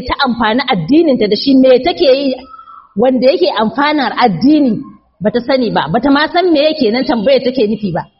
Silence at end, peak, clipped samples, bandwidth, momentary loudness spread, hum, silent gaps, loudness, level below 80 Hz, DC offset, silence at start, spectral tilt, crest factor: 0.15 s; 0 dBFS; under 0.1%; 5.8 kHz; 6 LU; none; none; -12 LUFS; -42 dBFS; under 0.1%; 0 s; -3.5 dB/octave; 12 dB